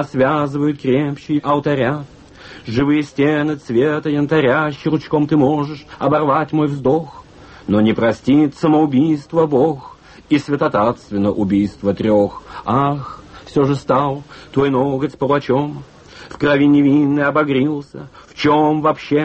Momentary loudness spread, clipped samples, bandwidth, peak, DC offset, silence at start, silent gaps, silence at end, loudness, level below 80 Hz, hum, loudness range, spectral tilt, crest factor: 9 LU; under 0.1%; 8.4 kHz; -4 dBFS; under 0.1%; 0 s; none; 0 s; -16 LUFS; -48 dBFS; none; 2 LU; -8 dB/octave; 14 dB